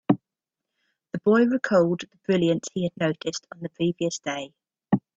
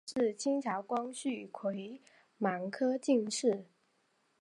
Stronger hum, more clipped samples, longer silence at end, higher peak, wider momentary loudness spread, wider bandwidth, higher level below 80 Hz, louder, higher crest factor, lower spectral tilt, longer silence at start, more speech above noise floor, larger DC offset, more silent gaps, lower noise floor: neither; neither; second, 0.2 s vs 0.75 s; first, -4 dBFS vs -18 dBFS; first, 14 LU vs 9 LU; second, 8.2 kHz vs 11.5 kHz; first, -64 dBFS vs -84 dBFS; first, -25 LUFS vs -35 LUFS; about the same, 22 dB vs 18 dB; first, -6 dB/octave vs -4.5 dB/octave; about the same, 0.1 s vs 0.05 s; first, 63 dB vs 41 dB; neither; neither; first, -88 dBFS vs -75 dBFS